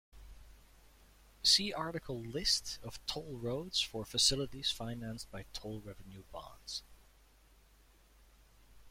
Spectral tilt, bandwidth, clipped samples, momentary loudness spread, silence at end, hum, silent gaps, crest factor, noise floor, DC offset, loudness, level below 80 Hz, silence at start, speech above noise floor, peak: -2.5 dB/octave; 16.5 kHz; under 0.1%; 20 LU; 0 s; none; none; 24 dB; -64 dBFS; under 0.1%; -35 LUFS; -58 dBFS; 0.15 s; 27 dB; -16 dBFS